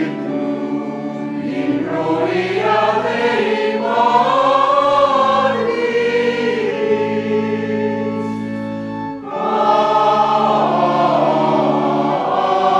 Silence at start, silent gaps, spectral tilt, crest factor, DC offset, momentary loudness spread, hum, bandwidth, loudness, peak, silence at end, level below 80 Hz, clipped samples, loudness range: 0 s; none; -6 dB/octave; 14 dB; under 0.1%; 10 LU; none; 10.5 kHz; -16 LUFS; -2 dBFS; 0 s; -58 dBFS; under 0.1%; 4 LU